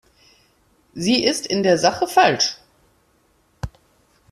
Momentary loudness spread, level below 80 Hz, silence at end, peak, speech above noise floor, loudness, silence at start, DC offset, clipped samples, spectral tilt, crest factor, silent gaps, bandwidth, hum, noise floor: 19 LU; -50 dBFS; 0.65 s; -2 dBFS; 43 dB; -18 LUFS; 0.95 s; under 0.1%; under 0.1%; -3.5 dB/octave; 20 dB; none; 14 kHz; none; -61 dBFS